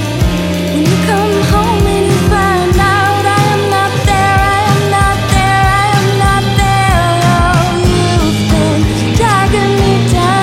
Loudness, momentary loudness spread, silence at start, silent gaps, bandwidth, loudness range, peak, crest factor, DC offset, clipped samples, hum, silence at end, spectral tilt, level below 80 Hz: -10 LUFS; 2 LU; 0 s; none; 16.5 kHz; 1 LU; 0 dBFS; 10 dB; under 0.1%; under 0.1%; none; 0 s; -5.5 dB/octave; -20 dBFS